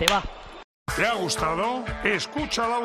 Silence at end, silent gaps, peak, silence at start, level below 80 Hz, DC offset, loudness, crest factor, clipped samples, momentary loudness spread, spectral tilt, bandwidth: 0 s; 0.64-0.86 s; -4 dBFS; 0 s; -42 dBFS; under 0.1%; -25 LUFS; 22 dB; under 0.1%; 15 LU; -3 dB/octave; 14 kHz